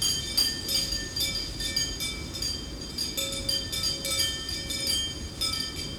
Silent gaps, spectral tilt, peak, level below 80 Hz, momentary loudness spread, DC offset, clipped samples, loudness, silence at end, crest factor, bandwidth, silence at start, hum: none; -1.5 dB/octave; -12 dBFS; -44 dBFS; 7 LU; under 0.1%; under 0.1%; -28 LUFS; 0 s; 18 dB; over 20 kHz; 0 s; none